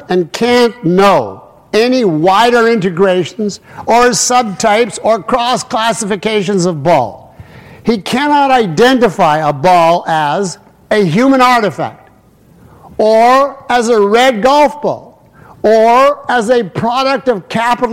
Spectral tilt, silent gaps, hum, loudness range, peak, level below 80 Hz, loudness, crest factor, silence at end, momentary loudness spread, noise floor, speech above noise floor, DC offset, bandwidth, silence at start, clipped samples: -4.5 dB/octave; none; none; 3 LU; 0 dBFS; -46 dBFS; -11 LUFS; 10 dB; 0 s; 9 LU; -45 dBFS; 34 dB; 0.2%; 16.5 kHz; 0 s; under 0.1%